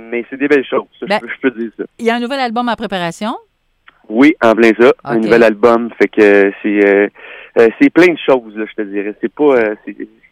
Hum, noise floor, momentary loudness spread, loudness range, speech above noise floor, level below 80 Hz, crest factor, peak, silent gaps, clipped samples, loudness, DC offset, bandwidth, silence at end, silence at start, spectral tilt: none; -50 dBFS; 14 LU; 6 LU; 38 dB; -54 dBFS; 12 dB; 0 dBFS; none; under 0.1%; -12 LUFS; under 0.1%; 12 kHz; 0.25 s; 0 s; -6 dB/octave